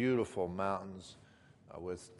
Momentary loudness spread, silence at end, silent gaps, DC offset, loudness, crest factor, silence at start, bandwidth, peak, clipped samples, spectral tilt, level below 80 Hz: 20 LU; 0 s; none; under 0.1%; -38 LUFS; 18 dB; 0 s; 11.5 kHz; -20 dBFS; under 0.1%; -6.5 dB/octave; -68 dBFS